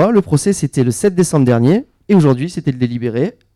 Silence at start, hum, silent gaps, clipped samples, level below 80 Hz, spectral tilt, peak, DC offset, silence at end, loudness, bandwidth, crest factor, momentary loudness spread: 0 s; none; none; under 0.1%; -48 dBFS; -7 dB/octave; -4 dBFS; under 0.1%; 0.25 s; -15 LUFS; 13.5 kHz; 10 dB; 7 LU